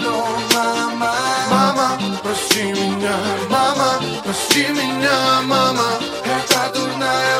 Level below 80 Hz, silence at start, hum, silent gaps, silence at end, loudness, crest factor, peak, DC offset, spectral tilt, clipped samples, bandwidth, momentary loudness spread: -54 dBFS; 0 s; none; none; 0 s; -17 LUFS; 18 dB; 0 dBFS; under 0.1%; -3 dB/octave; under 0.1%; 16.5 kHz; 6 LU